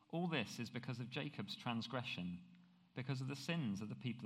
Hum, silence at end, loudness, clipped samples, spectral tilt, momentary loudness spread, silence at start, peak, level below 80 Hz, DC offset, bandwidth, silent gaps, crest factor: none; 0 s; -45 LUFS; under 0.1%; -5.5 dB/octave; 7 LU; 0.1 s; -24 dBFS; -86 dBFS; under 0.1%; 15 kHz; none; 20 dB